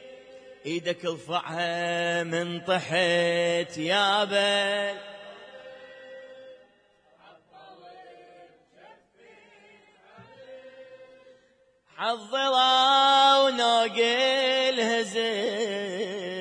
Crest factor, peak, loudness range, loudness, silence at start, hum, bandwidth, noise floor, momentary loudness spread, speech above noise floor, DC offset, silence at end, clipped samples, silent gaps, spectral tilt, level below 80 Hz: 20 dB; -8 dBFS; 12 LU; -24 LUFS; 0 s; none; 10.5 kHz; -64 dBFS; 26 LU; 39 dB; under 0.1%; 0 s; under 0.1%; none; -3 dB/octave; -78 dBFS